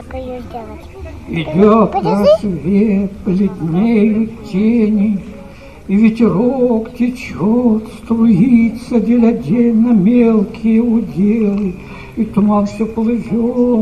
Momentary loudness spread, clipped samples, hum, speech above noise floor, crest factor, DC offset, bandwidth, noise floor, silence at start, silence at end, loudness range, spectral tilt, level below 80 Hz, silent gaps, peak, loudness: 16 LU; under 0.1%; none; 21 dB; 14 dB; 0.6%; 9 kHz; -34 dBFS; 0 s; 0 s; 3 LU; -9 dB/octave; -38 dBFS; none; 0 dBFS; -13 LUFS